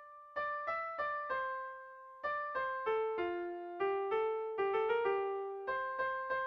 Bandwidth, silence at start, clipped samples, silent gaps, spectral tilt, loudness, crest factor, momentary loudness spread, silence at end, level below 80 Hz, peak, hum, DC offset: 5.8 kHz; 0 s; under 0.1%; none; -6 dB/octave; -37 LUFS; 14 dB; 9 LU; 0 s; -74 dBFS; -24 dBFS; none; under 0.1%